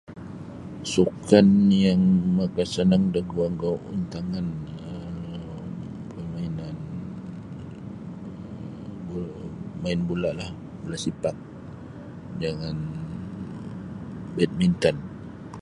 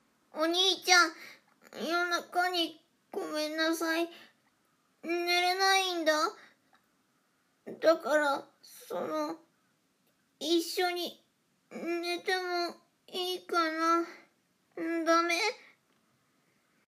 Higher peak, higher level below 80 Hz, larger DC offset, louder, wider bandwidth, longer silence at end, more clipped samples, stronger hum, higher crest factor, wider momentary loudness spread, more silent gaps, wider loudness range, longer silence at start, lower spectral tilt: first, -2 dBFS vs -8 dBFS; first, -50 dBFS vs under -90 dBFS; neither; first, -25 LUFS vs -30 LUFS; second, 11 kHz vs 15.5 kHz; second, 0 s vs 1.35 s; neither; neither; about the same, 24 dB vs 24 dB; first, 19 LU vs 16 LU; neither; first, 14 LU vs 5 LU; second, 0.1 s vs 0.35 s; first, -7 dB/octave vs -1 dB/octave